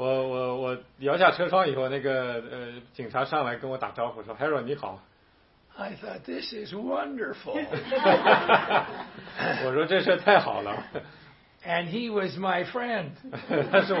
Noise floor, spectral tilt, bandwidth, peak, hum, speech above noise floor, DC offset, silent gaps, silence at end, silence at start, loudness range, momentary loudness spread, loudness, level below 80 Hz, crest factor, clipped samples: -61 dBFS; -9 dB/octave; 5.8 kHz; -2 dBFS; none; 35 dB; under 0.1%; none; 0 s; 0 s; 10 LU; 18 LU; -26 LUFS; -66 dBFS; 24 dB; under 0.1%